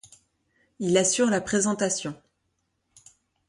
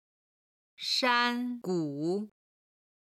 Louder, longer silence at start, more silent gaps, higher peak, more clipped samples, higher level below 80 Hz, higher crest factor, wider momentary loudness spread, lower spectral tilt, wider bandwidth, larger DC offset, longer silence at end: first, -24 LUFS vs -30 LUFS; about the same, 0.8 s vs 0.8 s; neither; first, -8 dBFS vs -12 dBFS; neither; first, -64 dBFS vs -84 dBFS; about the same, 20 dB vs 20 dB; about the same, 10 LU vs 11 LU; about the same, -3.5 dB/octave vs -4 dB/octave; second, 11.5 kHz vs 15 kHz; neither; first, 1.35 s vs 0.8 s